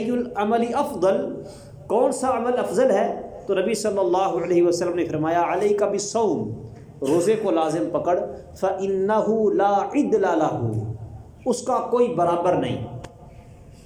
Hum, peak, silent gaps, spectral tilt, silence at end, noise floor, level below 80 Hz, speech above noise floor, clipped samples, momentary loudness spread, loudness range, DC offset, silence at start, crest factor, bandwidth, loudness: none; -6 dBFS; none; -6 dB/octave; 0 s; -44 dBFS; -54 dBFS; 23 dB; under 0.1%; 12 LU; 2 LU; under 0.1%; 0 s; 16 dB; 15.5 kHz; -22 LUFS